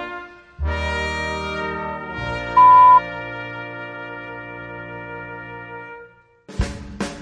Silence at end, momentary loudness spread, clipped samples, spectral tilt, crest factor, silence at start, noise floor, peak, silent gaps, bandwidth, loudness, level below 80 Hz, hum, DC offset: 0 s; 23 LU; under 0.1%; -5.5 dB/octave; 16 dB; 0 s; -47 dBFS; -4 dBFS; none; 10.5 kHz; -18 LUFS; -36 dBFS; none; under 0.1%